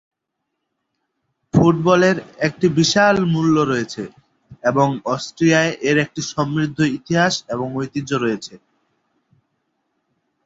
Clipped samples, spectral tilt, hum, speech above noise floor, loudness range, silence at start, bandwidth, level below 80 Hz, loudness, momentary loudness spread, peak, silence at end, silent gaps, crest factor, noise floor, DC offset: under 0.1%; -5.5 dB/octave; none; 60 dB; 6 LU; 1.55 s; 7.8 kHz; -52 dBFS; -18 LUFS; 10 LU; -2 dBFS; 1.9 s; none; 18 dB; -78 dBFS; under 0.1%